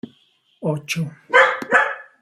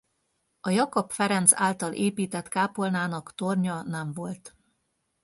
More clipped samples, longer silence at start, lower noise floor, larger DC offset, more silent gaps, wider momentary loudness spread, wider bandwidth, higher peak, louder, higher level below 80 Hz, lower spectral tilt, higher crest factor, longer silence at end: neither; about the same, 0.6 s vs 0.65 s; second, -60 dBFS vs -76 dBFS; neither; neither; second, 11 LU vs 15 LU; first, 15.5 kHz vs 12 kHz; about the same, 0 dBFS vs 0 dBFS; first, -18 LUFS vs -26 LUFS; about the same, -68 dBFS vs -70 dBFS; about the same, -4.5 dB/octave vs -4 dB/octave; second, 20 dB vs 28 dB; second, 0.2 s vs 0.75 s